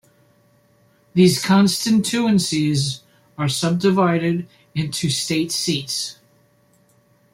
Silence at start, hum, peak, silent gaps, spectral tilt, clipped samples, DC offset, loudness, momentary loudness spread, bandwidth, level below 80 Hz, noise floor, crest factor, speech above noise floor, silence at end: 1.15 s; none; -2 dBFS; none; -5 dB/octave; under 0.1%; under 0.1%; -19 LUFS; 10 LU; 16.5 kHz; -58 dBFS; -58 dBFS; 18 dB; 39 dB; 1.2 s